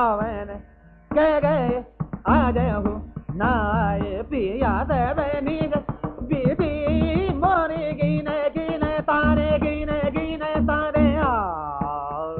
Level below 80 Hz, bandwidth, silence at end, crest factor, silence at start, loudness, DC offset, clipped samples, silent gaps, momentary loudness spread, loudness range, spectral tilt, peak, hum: -34 dBFS; 4.5 kHz; 0 s; 16 dB; 0 s; -23 LUFS; under 0.1%; under 0.1%; none; 9 LU; 2 LU; -6 dB/octave; -6 dBFS; none